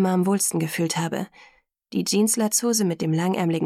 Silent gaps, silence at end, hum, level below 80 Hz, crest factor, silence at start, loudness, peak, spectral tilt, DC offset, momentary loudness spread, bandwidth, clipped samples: none; 0 s; none; -68 dBFS; 14 dB; 0 s; -23 LUFS; -8 dBFS; -4.5 dB/octave; under 0.1%; 9 LU; 16 kHz; under 0.1%